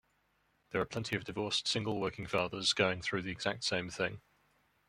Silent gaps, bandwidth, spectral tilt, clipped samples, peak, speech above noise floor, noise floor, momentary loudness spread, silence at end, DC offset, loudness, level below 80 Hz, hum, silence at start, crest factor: none; 16 kHz; -3.5 dB/octave; under 0.1%; -14 dBFS; 40 dB; -75 dBFS; 7 LU; 0.7 s; under 0.1%; -35 LUFS; -66 dBFS; none; 0.7 s; 22 dB